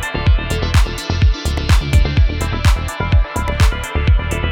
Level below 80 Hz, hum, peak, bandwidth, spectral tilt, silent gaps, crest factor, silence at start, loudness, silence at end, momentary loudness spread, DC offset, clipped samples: -16 dBFS; none; -2 dBFS; 16.5 kHz; -5.5 dB/octave; none; 14 dB; 0 s; -17 LUFS; 0 s; 4 LU; under 0.1%; under 0.1%